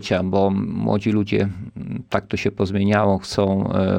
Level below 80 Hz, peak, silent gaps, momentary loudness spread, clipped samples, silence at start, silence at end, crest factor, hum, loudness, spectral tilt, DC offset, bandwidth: -48 dBFS; -4 dBFS; none; 7 LU; under 0.1%; 0 s; 0 s; 16 dB; none; -21 LUFS; -7 dB/octave; under 0.1%; 10.5 kHz